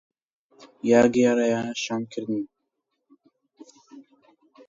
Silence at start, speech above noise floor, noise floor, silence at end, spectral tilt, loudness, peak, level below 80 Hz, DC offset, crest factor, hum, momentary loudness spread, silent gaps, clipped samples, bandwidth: 0.6 s; 57 dB; -79 dBFS; 0.65 s; -5 dB/octave; -23 LUFS; -6 dBFS; -66 dBFS; under 0.1%; 20 dB; none; 13 LU; none; under 0.1%; 7.6 kHz